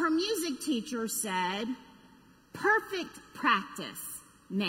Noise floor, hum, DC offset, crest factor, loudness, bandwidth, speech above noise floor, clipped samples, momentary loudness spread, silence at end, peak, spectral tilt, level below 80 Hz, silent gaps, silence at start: -59 dBFS; none; under 0.1%; 20 dB; -31 LUFS; 16 kHz; 27 dB; under 0.1%; 14 LU; 0 s; -12 dBFS; -3 dB/octave; -70 dBFS; none; 0 s